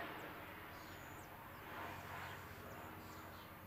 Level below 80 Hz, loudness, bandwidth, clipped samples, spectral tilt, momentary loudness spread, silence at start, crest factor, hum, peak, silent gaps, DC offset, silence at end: -70 dBFS; -52 LUFS; 16 kHz; under 0.1%; -4.5 dB/octave; 4 LU; 0 s; 16 dB; none; -36 dBFS; none; under 0.1%; 0 s